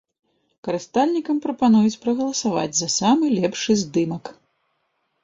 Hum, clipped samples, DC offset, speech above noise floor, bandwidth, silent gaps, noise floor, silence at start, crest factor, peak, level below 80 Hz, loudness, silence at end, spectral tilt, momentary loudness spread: none; under 0.1%; under 0.1%; 51 dB; 7.8 kHz; none; -71 dBFS; 0.65 s; 16 dB; -6 dBFS; -62 dBFS; -21 LUFS; 0.9 s; -4.5 dB/octave; 11 LU